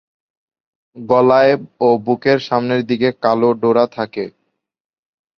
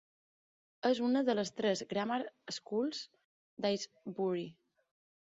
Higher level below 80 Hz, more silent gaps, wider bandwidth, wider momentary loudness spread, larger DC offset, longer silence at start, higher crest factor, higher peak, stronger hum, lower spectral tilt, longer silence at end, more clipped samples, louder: first, -60 dBFS vs -82 dBFS; second, none vs 3.25-3.57 s; second, 6.4 kHz vs 7.6 kHz; about the same, 12 LU vs 13 LU; neither; about the same, 0.95 s vs 0.85 s; about the same, 16 dB vs 18 dB; first, -2 dBFS vs -18 dBFS; neither; first, -7.5 dB/octave vs -4 dB/octave; first, 1.1 s vs 0.85 s; neither; first, -15 LUFS vs -36 LUFS